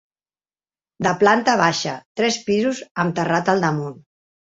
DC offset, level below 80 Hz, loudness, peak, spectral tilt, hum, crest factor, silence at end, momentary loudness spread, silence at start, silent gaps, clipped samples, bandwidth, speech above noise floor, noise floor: under 0.1%; -60 dBFS; -19 LUFS; -2 dBFS; -4.5 dB/octave; 50 Hz at -60 dBFS; 20 dB; 0.45 s; 9 LU; 1 s; 2.06-2.15 s, 2.91-2.95 s; under 0.1%; 8 kHz; over 71 dB; under -90 dBFS